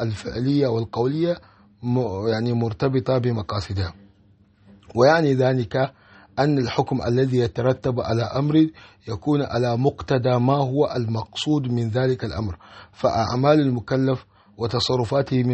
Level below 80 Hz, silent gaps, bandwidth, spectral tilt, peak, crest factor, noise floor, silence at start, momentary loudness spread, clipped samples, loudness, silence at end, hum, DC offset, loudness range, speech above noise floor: -50 dBFS; none; 8.4 kHz; -7 dB/octave; -4 dBFS; 18 dB; -56 dBFS; 0 s; 9 LU; under 0.1%; -22 LUFS; 0 s; none; under 0.1%; 2 LU; 35 dB